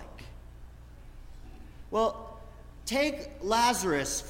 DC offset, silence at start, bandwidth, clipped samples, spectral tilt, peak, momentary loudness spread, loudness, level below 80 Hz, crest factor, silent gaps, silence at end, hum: under 0.1%; 0 s; 16.5 kHz; under 0.1%; -3 dB/octave; -14 dBFS; 26 LU; -29 LUFS; -48 dBFS; 18 dB; none; 0 s; none